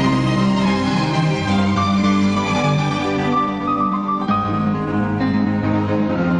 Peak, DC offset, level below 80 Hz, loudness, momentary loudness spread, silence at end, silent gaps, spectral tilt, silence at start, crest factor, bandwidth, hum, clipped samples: -6 dBFS; under 0.1%; -42 dBFS; -18 LUFS; 3 LU; 0 s; none; -6.5 dB/octave; 0 s; 12 dB; 10 kHz; none; under 0.1%